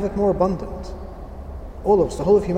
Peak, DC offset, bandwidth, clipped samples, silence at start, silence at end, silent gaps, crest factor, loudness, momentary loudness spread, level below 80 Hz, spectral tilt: -6 dBFS; under 0.1%; 10 kHz; under 0.1%; 0 s; 0 s; none; 16 dB; -20 LUFS; 18 LU; -34 dBFS; -8 dB/octave